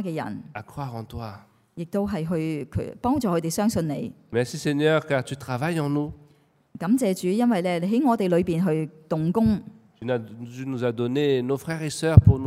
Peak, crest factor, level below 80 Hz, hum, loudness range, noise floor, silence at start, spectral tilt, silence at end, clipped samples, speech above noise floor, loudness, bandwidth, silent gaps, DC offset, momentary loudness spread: 0 dBFS; 24 dB; -42 dBFS; none; 4 LU; -60 dBFS; 0 s; -7 dB/octave; 0 s; under 0.1%; 36 dB; -24 LUFS; 15.5 kHz; none; under 0.1%; 13 LU